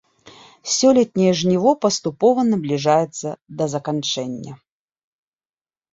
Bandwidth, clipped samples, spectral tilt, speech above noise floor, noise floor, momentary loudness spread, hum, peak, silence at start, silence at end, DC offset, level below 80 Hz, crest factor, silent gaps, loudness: 8 kHz; under 0.1%; -5 dB/octave; over 72 dB; under -90 dBFS; 14 LU; none; -2 dBFS; 0.25 s; 1.4 s; under 0.1%; -62 dBFS; 18 dB; none; -19 LUFS